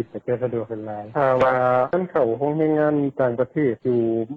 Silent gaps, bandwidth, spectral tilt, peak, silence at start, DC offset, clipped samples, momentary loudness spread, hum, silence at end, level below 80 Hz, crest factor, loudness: none; 7.2 kHz; -9.5 dB/octave; -8 dBFS; 0 s; under 0.1%; under 0.1%; 9 LU; none; 0 s; -58 dBFS; 14 dB; -21 LUFS